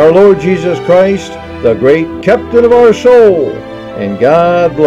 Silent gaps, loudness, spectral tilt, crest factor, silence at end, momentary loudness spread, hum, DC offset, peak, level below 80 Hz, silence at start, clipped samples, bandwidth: none; -8 LUFS; -7 dB/octave; 8 dB; 0 s; 13 LU; none; under 0.1%; 0 dBFS; -38 dBFS; 0 s; 3%; 8.4 kHz